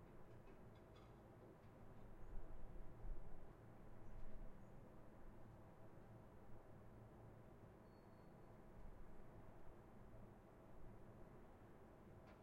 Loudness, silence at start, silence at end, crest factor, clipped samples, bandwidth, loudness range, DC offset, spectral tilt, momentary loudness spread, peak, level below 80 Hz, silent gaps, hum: -64 LUFS; 0 s; 0 s; 18 dB; under 0.1%; 6.6 kHz; 2 LU; under 0.1%; -7.5 dB/octave; 4 LU; -38 dBFS; -62 dBFS; none; none